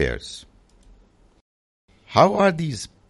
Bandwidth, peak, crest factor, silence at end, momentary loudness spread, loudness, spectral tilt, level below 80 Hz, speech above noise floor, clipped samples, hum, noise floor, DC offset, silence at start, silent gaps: 11.5 kHz; -2 dBFS; 22 dB; 0.25 s; 20 LU; -20 LUFS; -5.5 dB/octave; -44 dBFS; 35 dB; under 0.1%; none; -55 dBFS; under 0.1%; 0 s; 1.41-1.88 s